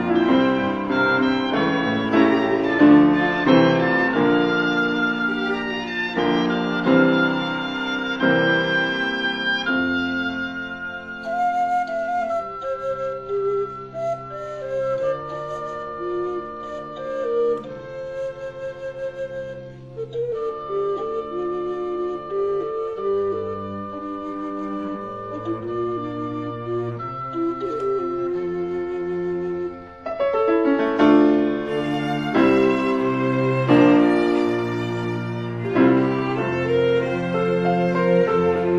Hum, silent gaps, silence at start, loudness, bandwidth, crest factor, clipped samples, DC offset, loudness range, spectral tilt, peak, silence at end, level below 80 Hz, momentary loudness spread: none; none; 0 s; -21 LUFS; 7.6 kHz; 20 dB; under 0.1%; 0.1%; 10 LU; -7 dB/octave; -2 dBFS; 0 s; -54 dBFS; 13 LU